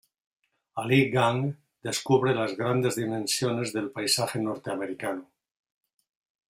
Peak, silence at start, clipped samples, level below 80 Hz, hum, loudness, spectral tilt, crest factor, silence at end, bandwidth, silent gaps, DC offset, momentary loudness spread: -8 dBFS; 0.75 s; under 0.1%; -68 dBFS; none; -27 LUFS; -4.5 dB/octave; 20 dB; 1.25 s; 16 kHz; none; under 0.1%; 10 LU